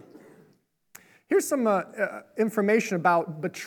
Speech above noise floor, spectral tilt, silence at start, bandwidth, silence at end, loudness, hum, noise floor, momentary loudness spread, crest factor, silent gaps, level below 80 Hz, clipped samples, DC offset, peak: 40 dB; -5.5 dB/octave; 0.15 s; 19.5 kHz; 0 s; -25 LUFS; none; -65 dBFS; 8 LU; 20 dB; none; -84 dBFS; under 0.1%; under 0.1%; -8 dBFS